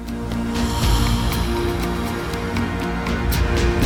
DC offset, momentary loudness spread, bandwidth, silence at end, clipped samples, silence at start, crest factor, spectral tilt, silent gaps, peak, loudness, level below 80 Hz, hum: under 0.1%; 5 LU; 19 kHz; 0 s; under 0.1%; 0 s; 16 dB; -5.5 dB/octave; none; -4 dBFS; -22 LUFS; -24 dBFS; none